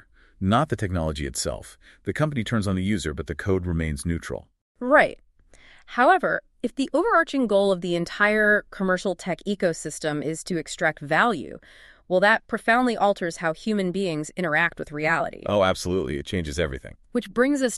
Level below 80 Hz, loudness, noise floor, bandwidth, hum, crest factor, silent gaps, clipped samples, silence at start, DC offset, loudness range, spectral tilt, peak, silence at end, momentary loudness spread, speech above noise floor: -44 dBFS; -24 LUFS; -53 dBFS; 13 kHz; none; 20 dB; 4.61-4.75 s; under 0.1%; 0.4 s; under 0.1%; 4 LU; -5 dB/octave; -4 dBFS; 0 s; 11 LU; 29 dB